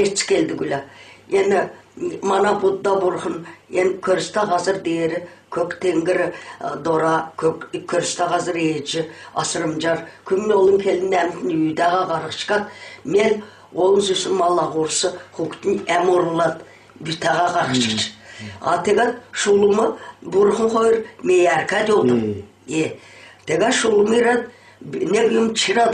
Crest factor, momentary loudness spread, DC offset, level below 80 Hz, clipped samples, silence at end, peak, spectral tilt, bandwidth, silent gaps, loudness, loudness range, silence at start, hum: 14 dB; 12 LU; under 0.1%; -58 dBFS; under 0.1%; 0 s; -4 dBFS; -4 dB/octave; 10.5 kHz; none; -19 LUFS; 3 LU; 0 s; none